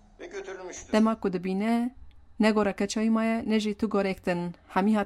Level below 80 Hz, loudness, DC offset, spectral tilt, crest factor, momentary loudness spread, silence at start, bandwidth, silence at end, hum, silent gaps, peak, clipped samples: -56 dBFS; -27 LUFS; under 0.1%; -6 dB/octave; 18 dB; 14 LU; 0.2 s; 12 kHz; 0 s; none; none; -8 dBFS; under 0.1%